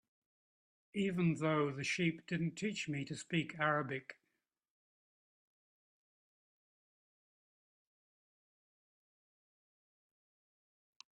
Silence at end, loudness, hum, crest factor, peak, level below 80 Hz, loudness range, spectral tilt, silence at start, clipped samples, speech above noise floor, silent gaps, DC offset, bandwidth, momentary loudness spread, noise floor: 7 s; -37 LUFS; none; 22 dB; -20 dBFS; -80 dBFS; 7 LU; -5.5 dB/octave; 0.95 s; under 0.1%; 50 dB; none; under 0.1%; 10.5 kHz; 8 LU; -87 dBFS